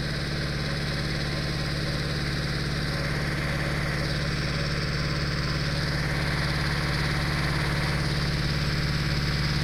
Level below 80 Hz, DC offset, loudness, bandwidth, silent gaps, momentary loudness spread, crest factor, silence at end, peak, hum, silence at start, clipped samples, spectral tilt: -36 dBFS; under 0.1%; -27 LUFS; 15.5 kHz; none; 2 LU; 14 dB; 0 s; -14 dBFS; none; 0 s; under 0.1%; -5 dB/octave